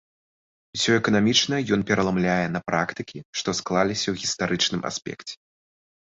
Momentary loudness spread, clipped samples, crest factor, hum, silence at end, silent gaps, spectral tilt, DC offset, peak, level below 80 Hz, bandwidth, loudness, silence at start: 15 LU; under 0.1%; 20 dB; none; 0.8 s; 3.25-3.33 s; -4 dB/octave; under 0.1%; -6 dBFS; -54 dBFS; 8.2 kHz; -23 LUFS; 0.75 s